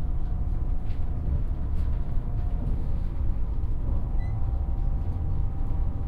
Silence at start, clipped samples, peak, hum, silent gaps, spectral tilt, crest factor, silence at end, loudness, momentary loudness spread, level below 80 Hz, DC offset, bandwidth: 0 s; under 0.1%; -14 dBFS; none; none; -10 dB/octave; 12 dB; 0 s; -31 LUFS; 2 LU; -26 dBFS; under 0.1%; 2.7 kHz